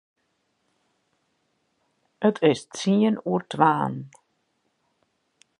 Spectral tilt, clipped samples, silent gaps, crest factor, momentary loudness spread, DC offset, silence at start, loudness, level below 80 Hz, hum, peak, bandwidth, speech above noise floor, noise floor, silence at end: -6 dB/octave; under 0.1%; none; 24 dB; 7 LU; under 0.1%; 2.2 s; -23 LUFS; -74 dBFS; none; -4 dBFS; 10.5 kHz; 50 dB; -73 dBFS; 1.5 s